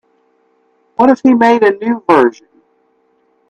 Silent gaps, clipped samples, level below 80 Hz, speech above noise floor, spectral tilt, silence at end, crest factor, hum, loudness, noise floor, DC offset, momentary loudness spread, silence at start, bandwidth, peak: none; under 0.1%; -58 dBFS; 47 dB; -6.5 dB/octave; 1.2 s; 14 dB; none; -11 LUFS; -57 dBFS; under 0.1%; 7 LU; 1 s; 8.4 kHz; 0 dBFS